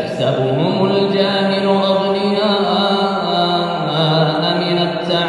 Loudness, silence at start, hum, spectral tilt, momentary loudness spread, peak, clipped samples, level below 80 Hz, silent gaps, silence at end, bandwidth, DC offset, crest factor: -15 LUFS; 0 s; none; -6.5 dB/octave; 2 LU; -2 dBFS; under 0.1%; -54 dBFS; none; 0 s; 11 kHz; under 0.1%; 14 dB